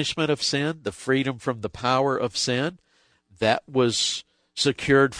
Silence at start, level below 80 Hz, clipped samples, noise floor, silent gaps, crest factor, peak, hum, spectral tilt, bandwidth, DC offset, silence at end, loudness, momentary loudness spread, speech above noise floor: 0 s; -56 dBFS; under 0.1%; -60 dBFS; none; 18 dB; -6 dBFS; none; -4 dB/octave; 10.5 kHz; under 0.1%; 0 s; -24 LUFS; 8 LU; 37 dB